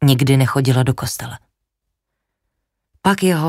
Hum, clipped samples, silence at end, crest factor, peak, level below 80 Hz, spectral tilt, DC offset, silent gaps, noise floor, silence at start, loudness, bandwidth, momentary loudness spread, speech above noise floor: none; under 0.1%; 0 s; 16 dB; -2 dBFS; -48 dBFS; -6 dB/octave; under 0.1%; none; -77 dBFS; 0 s; -17 LUFS; 16 kHz; 12 LU; 62 dB